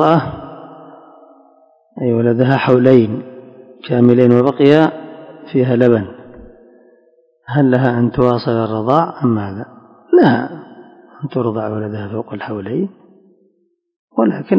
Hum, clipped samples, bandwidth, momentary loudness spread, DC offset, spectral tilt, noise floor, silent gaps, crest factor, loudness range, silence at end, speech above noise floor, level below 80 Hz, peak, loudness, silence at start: none; 0.3%; 6 kHz; 20 LU; under 0.1%; -9.5 dB/octave; -61 dBFS; 13.96-14.08 s; 16 dB; 9 LU; 0 s; 48 dB; -50 dBFS; 0 dBFS; -14 LUFS; 0 s